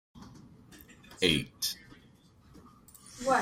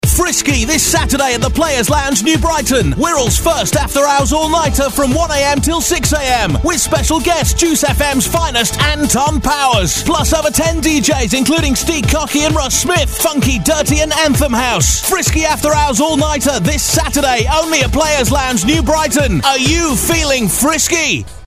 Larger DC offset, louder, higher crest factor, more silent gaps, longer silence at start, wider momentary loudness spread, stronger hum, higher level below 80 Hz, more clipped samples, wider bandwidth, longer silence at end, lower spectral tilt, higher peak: neither; second, -31 LUFS vs -12 LUFS; first, 24 dB vs 12 dB; neither; about the same, 0.15 s vs 0.05 s; first, 27 LU vs 2 LU; neither; second, -58 dBFS vs -22 dBFS; neither; about the same, 16 kHz vs 16 kHz; about the same, 0 s vs 0 s; about the same, -3 dB/octave vs -3.5 dB/octave; second, -12 dBFS vs 0 dBFS